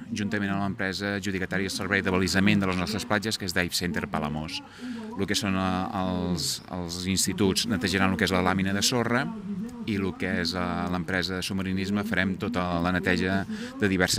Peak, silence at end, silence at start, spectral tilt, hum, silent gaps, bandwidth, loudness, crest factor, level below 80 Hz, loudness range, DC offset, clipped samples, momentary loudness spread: -6 dBFS; 0 s; 0 s; -4 dB/octave; none; none; 16 kHz; -27 LUFS; 20 dB; -56 dBFS; 3 LU; under 0.1%; under 0.1%; 8 LU